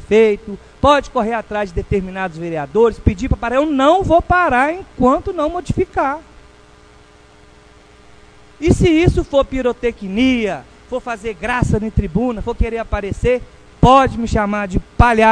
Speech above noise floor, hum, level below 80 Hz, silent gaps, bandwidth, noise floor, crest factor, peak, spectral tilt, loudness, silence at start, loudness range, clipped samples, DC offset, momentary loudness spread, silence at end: 30 dB; none; -28 dBFS; none; 10.5 kHz; -45 dBFS; 16 dB; 0 dBFS; -6.5 dB/octave; -16 LUFS; 0 s; 6 LU; under 0.1%; under 0.1%; 11 LU; 0 s